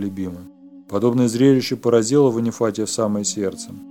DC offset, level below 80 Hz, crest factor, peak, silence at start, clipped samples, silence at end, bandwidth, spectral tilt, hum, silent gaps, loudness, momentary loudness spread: under 0.1%; -62 dBFS; 16 dB; -4 dBFS; 0 s; under 0.1%; 0 s; 16.5 kHz; -5.5 dB/octave; none; none; -19 LUFS; 13 LU